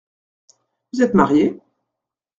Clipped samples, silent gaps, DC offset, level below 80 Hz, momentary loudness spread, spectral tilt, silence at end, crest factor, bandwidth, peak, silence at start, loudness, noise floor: under 0.1%; none; under 0.1%; -52 dBFS; 16 LU; -7 dB/octave; 0.85 s; 20 dB; 7.6 kHz; 0 dBFS; 0.95 s; -17 LUFS; -84 dBFS